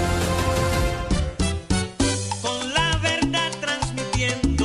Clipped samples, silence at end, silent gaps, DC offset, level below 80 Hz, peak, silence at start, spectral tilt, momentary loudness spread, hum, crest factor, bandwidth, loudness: under 0.1%; 0 s; none; under 0.1%; -30 dBFS; -8 dBFS; 0 s; -4 dB/octave; 4 LU; none; 14 dB; 14 kHz; -23 LUFS